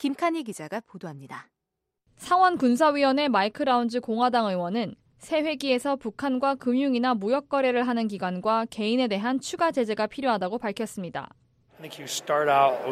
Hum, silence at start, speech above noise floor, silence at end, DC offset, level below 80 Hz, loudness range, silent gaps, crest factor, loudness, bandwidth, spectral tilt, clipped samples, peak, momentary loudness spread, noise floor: none; 0 s; 58 dB; 0 s; under 0.1%; -68 dBFS; 4 LU; none; 18 dB; -25 LUFS; 14.5 kHz; -4.5 dB/octave; under 0.1%; -8 dBFS; 15 LU; -83 dBFS